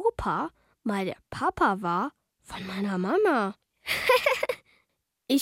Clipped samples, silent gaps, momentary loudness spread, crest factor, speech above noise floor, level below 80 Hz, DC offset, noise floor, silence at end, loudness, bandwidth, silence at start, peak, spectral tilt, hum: under 0.1%; none; 14 LU; 18 dB; 49 dB; -54 dBFS; under 0.1%; -76 dBFS; 0 s; -27 LUFS; 16.5 kHz; 0 s; -10 dBFS; -5 dB/octave; none